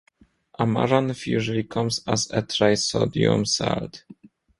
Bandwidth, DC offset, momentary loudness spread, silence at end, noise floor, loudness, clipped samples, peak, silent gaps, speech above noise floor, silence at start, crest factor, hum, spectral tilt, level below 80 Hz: 11.5 kHz; under 0.1%; 6 LU; 0.45 s; -57 dBFS; -23 LUFS; under 0.1%; -4 dBFS; none; 34 dB; 0.6 s; 20 dB; none; -4.5 dB/octave; -52 dBFS